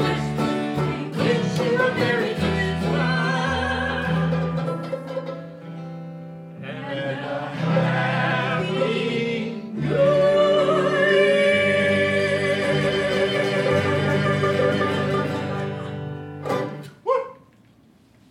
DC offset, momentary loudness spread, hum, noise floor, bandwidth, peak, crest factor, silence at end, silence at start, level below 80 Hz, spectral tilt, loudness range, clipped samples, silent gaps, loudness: under 0.1%; 14 LU; none; -54 dBFS; 12.5 kHz; -6 dBFS; 16 dB; 0.95 s; 0 s; -48 dBFS; -6 dB/octave; 9 LU; under 0.1%; none; -22 LUFS